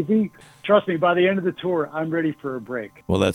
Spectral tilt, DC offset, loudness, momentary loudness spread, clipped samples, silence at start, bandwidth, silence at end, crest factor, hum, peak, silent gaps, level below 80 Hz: -7 dB/octave; under 0.1%; -22 LUFS; 13 LU; under 0.1%; 0 s; 12.5 kHz; 0 s; 18 dB; none; -4 dBFS; none; -58 dBFS